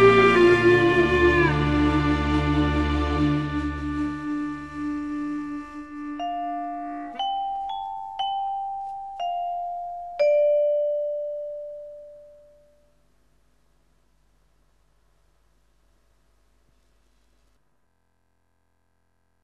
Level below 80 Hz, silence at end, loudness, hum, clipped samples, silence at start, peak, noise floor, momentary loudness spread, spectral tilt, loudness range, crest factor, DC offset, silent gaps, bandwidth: -38 dBFS; 7.15 s; -24 LUFS; none; under 0.1%; 0 s; -6 dBFS; -71 dBFS; 17 LU; -7 dB/octave; 10 LU; 20 dB; 0.2%; none; 9.8 kHz